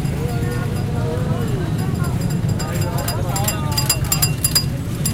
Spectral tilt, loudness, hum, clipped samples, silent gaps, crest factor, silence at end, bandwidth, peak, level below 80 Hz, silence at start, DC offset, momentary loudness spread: -4.5 dB/octave; -20 LUFS; none; under 0.1%; none; 18 dB; 0 s; 17 kHz; -2 dBFS; -32 dBFS; 0 s; under 0.1%; 5 LU